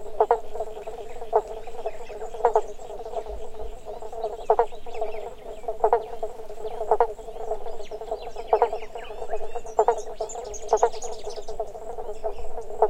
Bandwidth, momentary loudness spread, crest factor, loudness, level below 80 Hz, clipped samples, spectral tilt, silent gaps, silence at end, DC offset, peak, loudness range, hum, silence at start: 9.8 kHz; 14 LU; 22 dB; -29 LUFS; -42 dBFS; under 0.1%; -4 dB/octave; none; 0 s; under 0.1%; -4 dBFS; 3 LU; none; 0 s